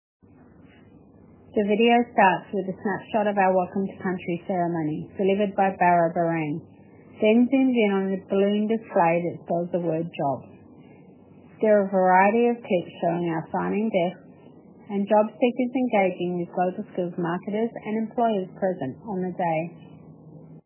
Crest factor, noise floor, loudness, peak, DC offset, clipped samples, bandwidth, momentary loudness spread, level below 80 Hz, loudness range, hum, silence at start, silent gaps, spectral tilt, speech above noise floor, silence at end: 20 dB; -51 dBFS; -24 LUFS; -6 dBFS; under 0.1%; under 0.1%; 3.2 kHz; 10 LU; -66 dBFS; 4 LU; none; 1.55 s; none; -10.5 dB/octave; 28 dB; 0.05 s